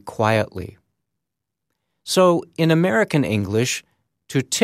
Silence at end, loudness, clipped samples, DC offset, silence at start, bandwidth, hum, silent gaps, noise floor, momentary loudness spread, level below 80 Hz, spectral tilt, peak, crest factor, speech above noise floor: 0 s; -20 LUFS; under 0.1%; under 0.1%; 0.05 s; 15.5 kHz; none; none; -83 dBFS; 12 LU; -58 dBFS; -5 dB/octave; -2 dBFS; 18 dB; 64 dB